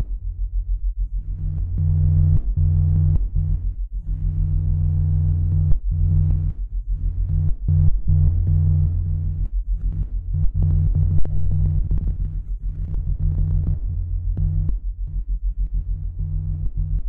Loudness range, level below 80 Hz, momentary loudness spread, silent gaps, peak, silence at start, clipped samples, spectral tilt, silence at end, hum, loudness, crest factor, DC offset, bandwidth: 4 LU; -22 dBFS; 10 LU; none; -4 dBFS; 0 s; under 0.1%; -13.5 dB/octave; 0 s; none; -23 LUFS; 14 dB; under 0.1%; 1.2 kHz